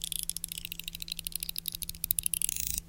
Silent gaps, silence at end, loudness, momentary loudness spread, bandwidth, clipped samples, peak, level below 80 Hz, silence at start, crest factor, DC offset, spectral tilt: none; 0 s; -33 LUFS; 9 LU; 17.5 kHz; under 0.1%; -2 dBFS; -50 dBFS; 0 s; 34 dB; under 0.1%; 0 dB/octave